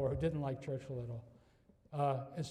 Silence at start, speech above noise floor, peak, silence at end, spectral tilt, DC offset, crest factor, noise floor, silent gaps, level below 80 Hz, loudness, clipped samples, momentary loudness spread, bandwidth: 0 s; 29 dB; -24 dBFS; 0 s; -7.5 dB/octave; under 0.1%; 16 dB; -68 dBFS; none; -60 dBFS; -40 LUFS; under 0.1%; 11 LU; 10 kHz